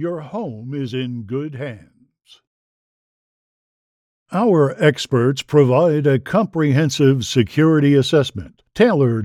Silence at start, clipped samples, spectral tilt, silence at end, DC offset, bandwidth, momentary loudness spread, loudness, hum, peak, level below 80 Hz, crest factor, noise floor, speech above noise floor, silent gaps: 0 s; under 0.1%; -6.5 dB/octave; 0 s; under 0.1%; 13.5 kHz; 13 LU; -17 LUFS; none; -2 dBFS; -56 dBFS; 16 dB; -52 dBFS; 36 dB; 2.47-4.26 s